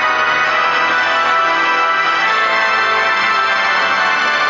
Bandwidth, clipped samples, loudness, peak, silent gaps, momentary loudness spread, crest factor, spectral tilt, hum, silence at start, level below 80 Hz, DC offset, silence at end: 7.6 kHz; under 0.1%; -13 LUFS; -2 dBFS; none; 0 LU; 12 dB; -1.5 dB/octave; none; 0 s; -56 dBFS; under 0.1%; 0 s